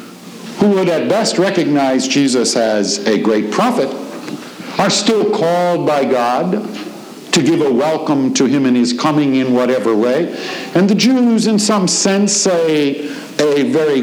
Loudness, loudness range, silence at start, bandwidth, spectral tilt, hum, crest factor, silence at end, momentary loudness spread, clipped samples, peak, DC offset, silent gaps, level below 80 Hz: -14 LUFS; 2 LU; 0 s; over 20 kHz; -4 dB/octave; none; 14 dB; 0 s; 11 LU; under 0.1%; 0 dBFS; under 0.1%; none; -62 dBFS